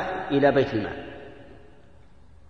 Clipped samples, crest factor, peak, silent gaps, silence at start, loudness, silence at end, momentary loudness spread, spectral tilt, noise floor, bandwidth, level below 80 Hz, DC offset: under 0.1%; 20 dB; -6 dBFS; none; 0 s; -23 LUFS; 0.9 s; 22 LU; -7.5 dB/octave; -54 dBFS; 6.6 kHz; -52 dBFS; 0.3%